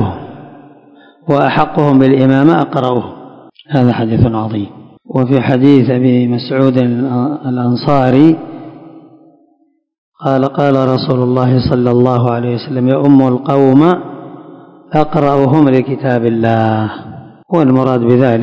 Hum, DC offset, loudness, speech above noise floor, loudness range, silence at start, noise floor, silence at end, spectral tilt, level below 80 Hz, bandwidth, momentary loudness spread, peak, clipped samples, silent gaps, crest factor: none; under 0.1%; -11 LUFS; 46 dB; 3 LU; 0 s; -56 dBFS; 0 s; -9.5 dB/octave; -42 dBFS; 6.2 kHz; 12 LU; 0 dBFS; 1%; 9.98-10.12 s; 12 dB